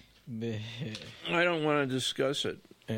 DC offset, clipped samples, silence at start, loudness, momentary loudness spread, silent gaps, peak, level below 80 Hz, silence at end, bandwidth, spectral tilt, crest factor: under 0.1%; under 0.1%; 0.25 s; -31 LUFS; 13 LU; none; -14 dBFS; -70 dBFS; 0 s; 16.5 kHz; -4.5 dB/octave; 18 dB